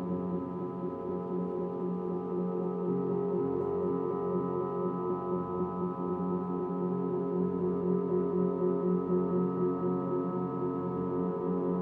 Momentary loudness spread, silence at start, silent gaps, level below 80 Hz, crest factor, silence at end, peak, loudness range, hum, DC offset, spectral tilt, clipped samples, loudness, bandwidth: 5 LU; 0 s; none; -66 dBFS; 14 dB; 0 s; -18 dBFS; 3 LU; none; under 0.1%; -12.5 dB/octave; under 0.1%; -32 LUFS; 3.6 kHz